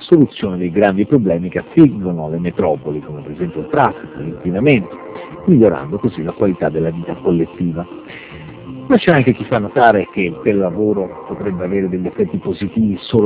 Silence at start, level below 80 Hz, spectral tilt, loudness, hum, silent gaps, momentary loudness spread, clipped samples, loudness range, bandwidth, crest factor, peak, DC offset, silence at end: 0 s; -44 dBFS; -11.5 dB/octave; -16 LUFS; none; none; 15 LU; 0.2%; 3 LU; 4 kHz; 16 dB; 0 dBFS; under 0.1%; 0 s